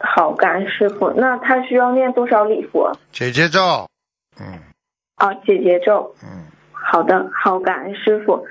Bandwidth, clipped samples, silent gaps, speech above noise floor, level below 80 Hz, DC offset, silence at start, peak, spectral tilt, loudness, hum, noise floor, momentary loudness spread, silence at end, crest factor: 7.8 kHz; under 0.1%; none; 41 dB; -60 dBFS; under 0.1%; 0 s; 0 dBFS; -5.5 dB/octave; -16 LUFS; none; -57 dBFS; 11 LU; 0 s; 18 dB